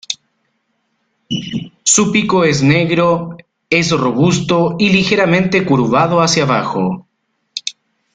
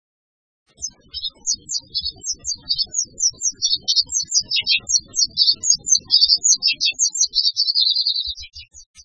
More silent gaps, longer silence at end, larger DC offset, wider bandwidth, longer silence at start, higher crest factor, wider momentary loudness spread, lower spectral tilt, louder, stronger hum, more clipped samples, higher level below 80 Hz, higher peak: second, none vs 8.86-8.94 s; first, 0.45 s vs 0.05 s; neither; about the same, 9.6 kHz vs 9.6 kHz; second, 0.1 s vs 0.8 s; second, 14 dB vs 20 dB; about the same, 13 LU vs 14 LU; first, -4.5 dB/octave vs 3.5 dB/octave; first, -13 LUFS vs -17 LUFS; neither; neither; about the same, -48 dBFS vs -52 dBFS; about the same, 0 dBFS vs 0 dBFS